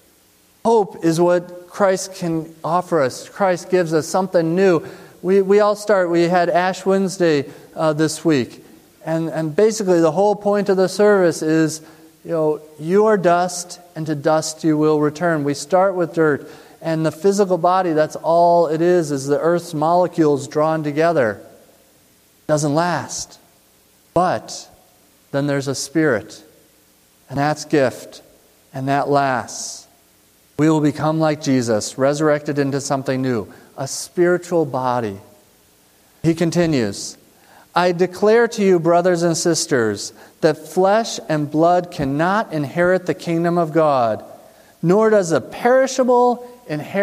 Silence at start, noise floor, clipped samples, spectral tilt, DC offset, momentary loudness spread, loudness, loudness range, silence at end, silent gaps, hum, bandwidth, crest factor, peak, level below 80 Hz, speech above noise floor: 0.65 s; -54 dBFS; under 0.1%; -5.5 dB/octave; under 0.1%; 11 LU; -18 LUFS; 6 LU; 0 s; none; none; 15.5 kHz; 16 dB; -2 dBFS; -58 dBFS; 37 dB